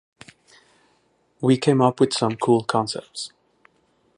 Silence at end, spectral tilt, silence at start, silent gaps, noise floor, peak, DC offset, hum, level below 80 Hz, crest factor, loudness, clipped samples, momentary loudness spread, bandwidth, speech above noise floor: 0.9 s; -6 dB/octave; 1.4 s; none; -64 dBFS; -4 dBFS; under 0.1%; none; -66 dBFS; 20 dB; -21 LUFS; under 0.1%; 15 LU; 11.5 kHz; 44 dB